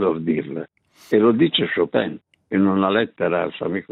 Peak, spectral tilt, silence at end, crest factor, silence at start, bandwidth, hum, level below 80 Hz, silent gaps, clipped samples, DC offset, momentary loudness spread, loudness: -4 dBFS; -7.5 dB/octave; 0.1 s; 16 dB; 0 s; 6.8 kHz; none; -64 dBFS; none; under 0.1%; under 0.1%; 13 LU; -20 LUFS